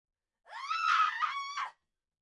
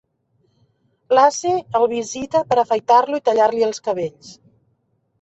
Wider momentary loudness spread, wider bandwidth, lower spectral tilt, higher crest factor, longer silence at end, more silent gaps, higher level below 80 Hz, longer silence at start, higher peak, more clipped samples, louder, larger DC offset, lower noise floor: first, 16 LU vs 9 LU; first, 11 kHz vs 8.2 kHz; second, 3.5 dB/octave vs -4 dB/octave; about the same, 18 dB vs 18 dB; second, 0.5 s vs 0.9 s; neither; second, -88 dBFS vs -62 dBFS; second, 0.5 s vs 1.1 s; second, -18 dBFS vs -2 dBFS; neither; second, -32 LUFS vs -18 LUFS; neither; second, -58 dBFS vs -67 dBFS